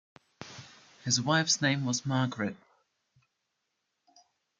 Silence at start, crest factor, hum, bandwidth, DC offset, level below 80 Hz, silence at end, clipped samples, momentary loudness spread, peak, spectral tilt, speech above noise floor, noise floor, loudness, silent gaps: 0.4 s; 22 dB; none; 10 kHz; under 0.1%; -74 dBFS; 2.05 s; under 0.1%; 21 LU; -12 dBFS; -3.5 dB/octave; 53 dB; -82 dBFS; -28 LUFS; none